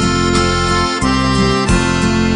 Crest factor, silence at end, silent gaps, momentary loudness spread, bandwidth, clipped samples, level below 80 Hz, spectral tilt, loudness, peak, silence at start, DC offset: 12 dB; 0 s; none; 1 LU; 10.5 kHz; under 0.1%; -24 dBFS; -5 dB/octave; -14 LUFS; 0 dBFS; 0 s; under 0.1%